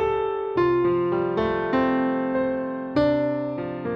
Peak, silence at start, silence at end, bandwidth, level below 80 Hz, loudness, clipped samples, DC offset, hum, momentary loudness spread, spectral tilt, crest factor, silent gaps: -10 dBFS; 0 s; 0 s; 5.8 kHz; -50 dBFS; -24 LUFS; under 0.1%; under 0.1%; none; 6 LU; -8.5 dB/octave; 14 dB; none